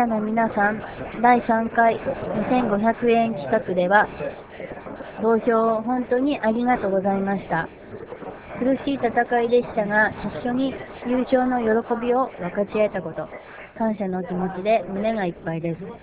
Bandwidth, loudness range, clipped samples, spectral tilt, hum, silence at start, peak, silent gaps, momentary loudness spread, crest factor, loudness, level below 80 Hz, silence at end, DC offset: 4 kHz; 4 LU; under 0.1%; -10.5 dB/octave; none; 0 s; -2 dBFS; none; 14 LU; 20 dB; -22 LUFS; -52 dBFS; 0.05 s; under 0.1%